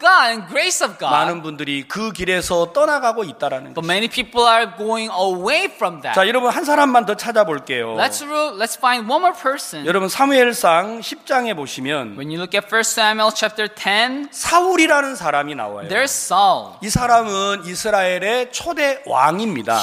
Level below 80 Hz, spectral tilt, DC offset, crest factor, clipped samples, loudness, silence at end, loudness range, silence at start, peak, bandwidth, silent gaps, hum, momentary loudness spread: -50 dBFS; -2.5 dB/octave; under 0.1%; 16 dB; under 0.1%; -17 LUFS; 0 s; 2 LU; 0 s; 0 dBFS; 15.5 kHz; none; none; 9 LU